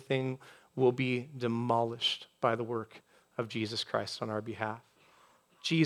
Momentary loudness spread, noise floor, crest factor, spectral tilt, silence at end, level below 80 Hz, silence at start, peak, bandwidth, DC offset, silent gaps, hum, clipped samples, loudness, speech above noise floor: 11 LU; -64 dBFS; 20 dB; -5.5 dB/octave; 0 s; -80 dBFS; 0 s; -14 dBFS; 13.5 kHz; under 0.1%; none; none; under 0.1%; -33 LUFS; 31 dB